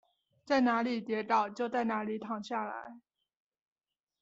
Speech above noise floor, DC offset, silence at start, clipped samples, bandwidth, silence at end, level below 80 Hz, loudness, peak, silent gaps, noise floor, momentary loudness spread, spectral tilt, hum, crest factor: over 58 dB; under 0.1%; 0.45 s; under 0.1%; 7.8 kHz; 1.2 s; -80 dBFS; -33 LUFS; -16 dBFS; none; under -90 dBFS; 11 LU; -3 dB/octave; none; 18 dB